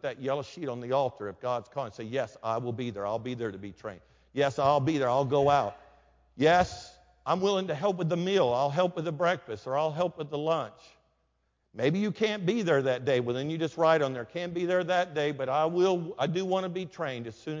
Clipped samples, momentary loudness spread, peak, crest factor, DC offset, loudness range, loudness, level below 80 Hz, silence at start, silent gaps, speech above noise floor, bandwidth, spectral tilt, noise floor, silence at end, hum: under 0.1%; 12 LU; -10 dBFS; 18 dB; under 0.1%; 5 LU; -29 LUFS; -62 dBFS; 0.05 s; none; 46 dB; 7.6 kHz; -6 dB/octave; -75 dBFS; 0 s; none